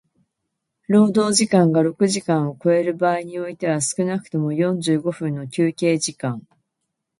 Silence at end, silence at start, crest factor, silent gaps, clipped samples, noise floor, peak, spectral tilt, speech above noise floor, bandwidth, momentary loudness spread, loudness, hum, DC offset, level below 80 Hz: 0.8 s; 0.9 s; 18 dB; none; under 0.1%; -78 dBFS; -2 dBFS; -5 dB/octave; 59 dB; 11.5 kHz; 10 LU; -20 LUFS; none; under 0.1%; -66 dBFS